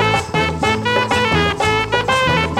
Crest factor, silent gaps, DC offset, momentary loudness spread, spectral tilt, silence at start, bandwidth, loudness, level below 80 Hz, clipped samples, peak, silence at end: 14 dB; none; under 0.1%; 2 LU; -4.5 dB/octave; 0 s; 16 kHz; -16 LUFS; -34 dBFS; under 0.1%; -4 dBFS; 0 s